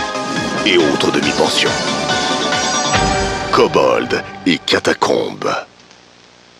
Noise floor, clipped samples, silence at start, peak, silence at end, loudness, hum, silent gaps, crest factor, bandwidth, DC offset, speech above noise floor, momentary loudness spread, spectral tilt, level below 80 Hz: -45 dBFS; under 0.1%; 0 s; 0 dBFS; 0.95 s; -15 LUFS; 60 Hz at -50 dBFS; none; 16 dB; 14 kHz; under 0.1%; 30 dB; 7 LU; -3 dB/octave; -38 dBFS